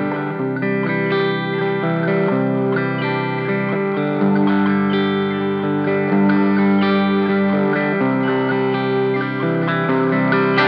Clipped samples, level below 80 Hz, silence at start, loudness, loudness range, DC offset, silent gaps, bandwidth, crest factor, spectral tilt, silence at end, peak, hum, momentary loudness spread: under 0.1%; -74 dBFS; 0 s; -18 LUFS; 2 LU; under 0.1%; none; 5.4 kHz; 14 dB; -9.5 dB/octave; 0 s; -2 dBFS; none; 5 LU